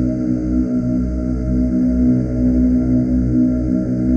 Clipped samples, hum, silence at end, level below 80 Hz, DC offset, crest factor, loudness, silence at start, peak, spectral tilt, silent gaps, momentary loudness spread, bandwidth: under 0.1%; none; 0 s; -24 dBFS; under 0.1%; 10 dB; -17 LUFS; 0 s; -6 dBFS; -10.5 dB/octave; none; 4 LU; 6.6 kHz